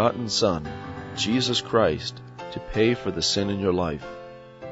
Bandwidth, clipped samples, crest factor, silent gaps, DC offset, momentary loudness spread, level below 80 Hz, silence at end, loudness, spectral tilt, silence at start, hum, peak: 8 kHz; under 0.1%; 18 dB; none; under 0.1%; 16 LU; -48 dBFS; 0 s; -24 LUFS; -4.5 dB/octave; 0 s; none; -8 dBFS